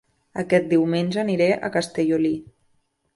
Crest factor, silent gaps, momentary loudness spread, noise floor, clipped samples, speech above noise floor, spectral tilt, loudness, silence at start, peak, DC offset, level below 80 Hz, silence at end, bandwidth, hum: 16 dB; none; 10 LU; -67 dBFS; under 0.1%; 46 dB; -6.5 dB/octave; -22 LUFS; 0.35 s; -6 dBFS; under 0.1%; -62 dBFS; 0.75 s; 11.5 kHz; none